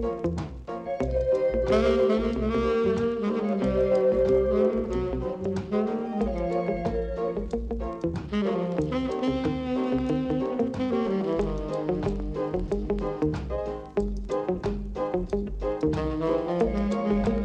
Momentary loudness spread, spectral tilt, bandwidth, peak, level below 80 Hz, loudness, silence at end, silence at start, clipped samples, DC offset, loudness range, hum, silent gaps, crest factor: 8 LU; -8 dB/octave; 9.2 kHz; -12 dBFS; -38 dBFS; -27 LUFS; 0 s; 0 s; under 0.1%; under 0.1%; 5 LU; none; none; 14 dB